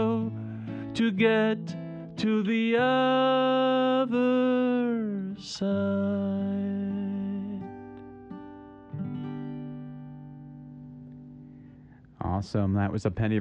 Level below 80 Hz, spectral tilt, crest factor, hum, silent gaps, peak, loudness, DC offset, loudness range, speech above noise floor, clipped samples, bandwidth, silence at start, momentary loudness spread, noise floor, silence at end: -58 dBFS; -7 dB/octave; 16 dB; none; none; -12 dBFS; -27 LUFS; under 0.1%; 15 LU; 26 dB; under 0.1%; 9 kHz; 0 s; 22 LU; -51 dBFS; 0 s